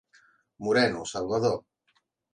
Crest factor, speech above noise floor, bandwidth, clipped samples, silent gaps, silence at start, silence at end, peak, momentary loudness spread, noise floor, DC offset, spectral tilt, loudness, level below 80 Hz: 18 dB; 46 dB; 10.5 kHz; under 0.1%; none; 0.6 s; 0.75 s; -10 dBFS; 11 LU; -72 dBFS; under 0.1%; -4.5 dB/octave; -27 LUFS; -62 dBFS